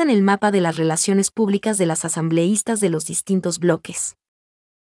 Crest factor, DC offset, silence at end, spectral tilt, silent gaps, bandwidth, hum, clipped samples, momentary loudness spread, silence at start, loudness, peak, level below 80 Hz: 14 dB; under 0.1%; 0.85 s; -4.5 dB/octave; none; 12 kHz; none; under 0.1%; 6 LU; 0 s; -19 LUFS; -4 dBFS; -66 dBFS